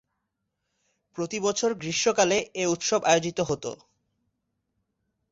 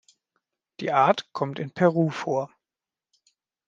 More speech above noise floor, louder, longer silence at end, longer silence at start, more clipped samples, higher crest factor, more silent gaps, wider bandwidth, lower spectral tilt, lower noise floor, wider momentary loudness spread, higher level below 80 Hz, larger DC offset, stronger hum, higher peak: second, 55 dB vs over 66 dB; about the same, -25 LUFS vs -24 LUFS; first, 1.55 s vs 1.2 s; first, 1.15 s vs 0.8 s; neither; about the same, 22 dB vs 22 dB; neither; about the same, 8 kHz vs 7.6 kHz; second, -3 dB/octave vs -7 dB/octave; second, -80 dBFS vs under -90 dBFS; about the same, 11 LU vs 10 LU; first, -64 dBFS vs -74 dBFS; neither; neither; second, -8 dBFS vs -4 dBFS